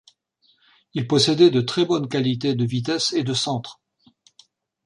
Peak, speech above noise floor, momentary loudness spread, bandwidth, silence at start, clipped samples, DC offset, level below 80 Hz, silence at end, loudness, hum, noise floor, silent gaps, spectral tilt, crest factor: -4 dBFS; 44 dB; 14 LU; 11 kHz; 0.95 s; under 0.1%; under 0.1%; -62 dBFS; 1.15 s; -21 LUFS; none; -64 dBFS; none; -5 dB/octave; 20 dB